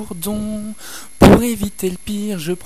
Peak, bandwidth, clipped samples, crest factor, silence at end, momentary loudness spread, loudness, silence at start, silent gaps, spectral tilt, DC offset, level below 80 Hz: 0 dBFS; 14 kHz; 0.3%; 16 dB; 0.1 s; 19 LU; -16 LUFS; 0 s; none; -6 dB/octave; 2%; -30 dBFS